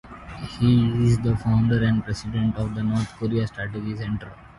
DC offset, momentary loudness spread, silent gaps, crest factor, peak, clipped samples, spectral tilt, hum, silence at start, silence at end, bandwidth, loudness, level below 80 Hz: under 0.1%; 11 LU; none; 14 dB; -8 dBFS; under 0.1%; -7.5 dB/octave; none; 0.05 s; 0.1 s; 11.5 kHz; -23 LUFS; -42 dBFS